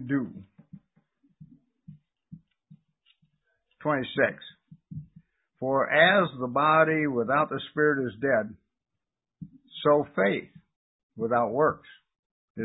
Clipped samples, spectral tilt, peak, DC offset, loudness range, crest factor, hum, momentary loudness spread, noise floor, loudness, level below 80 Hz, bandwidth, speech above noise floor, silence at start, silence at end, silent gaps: under 0.1%; -10 dB/octave; -6 dBFS; under 0.1%; 10 LU; 22 dB; none; 23 LU; -87 dBFS; -25 LUFS; -66 dBFS; 4 kHz; 62 dB; 0 s; 0 s; 10.76-11.10 s, 12.19-12.55 s